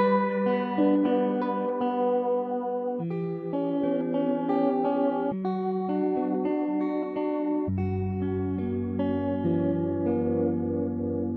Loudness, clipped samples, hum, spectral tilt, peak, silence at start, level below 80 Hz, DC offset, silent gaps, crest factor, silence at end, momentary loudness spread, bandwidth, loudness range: -27 LUFS; under 0.1%; none; -11 dB/octave; -12 dBFS; 0 s; -62 dBFS; under 0.1%; none; 14 dB; 0 s; 5 LU; 4.7 kHz; 2 LU